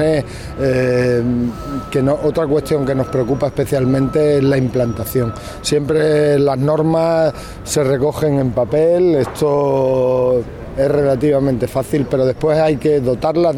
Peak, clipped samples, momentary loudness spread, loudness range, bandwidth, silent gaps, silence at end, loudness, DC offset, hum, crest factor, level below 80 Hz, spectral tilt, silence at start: -4 dBFS; under 0.1%; 6 LU; 2 LU; 16.5 kHz; none; 0 s; -16 LUFS; 0.1%; none; 12 dB; -38 dBFS; -7 dB/octave; 0 s